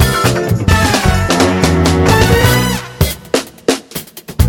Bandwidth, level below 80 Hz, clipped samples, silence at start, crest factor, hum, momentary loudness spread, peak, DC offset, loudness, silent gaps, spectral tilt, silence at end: 18 kHz; -22 dBFS; under 0.1%; 0 s; 12 dB; none; 9 LU; 0 dBFS; under 0.1%; -12 LUFS; none; -5 dB/octave; 0 s